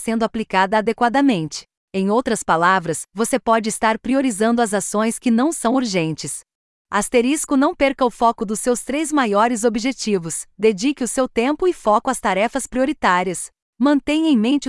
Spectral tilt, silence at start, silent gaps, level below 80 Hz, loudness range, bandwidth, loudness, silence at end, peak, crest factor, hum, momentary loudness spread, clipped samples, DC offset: -4 dB/octave; 0 s; 1.77-1.88 s, 6.55-6.85 s, 13.62-13.73 s; -50 dBFS; 1 LU; 12 kHz; -19 LUFS; 0 s; -4 dBFS; 16 dB; none; 7 LU; under 0.1%; under 0.1%